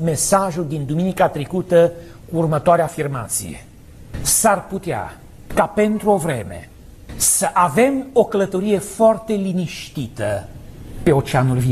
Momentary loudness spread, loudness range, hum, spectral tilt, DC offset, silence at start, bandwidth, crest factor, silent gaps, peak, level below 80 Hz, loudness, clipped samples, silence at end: 14 LU; 2 LU; none; -5 dB/octave; under 0.1%; 0 s; 14 kHz; 16 dB; none; -2 dBFS; -42 dBFS; -18 LUFS; under 0.1%; 0 s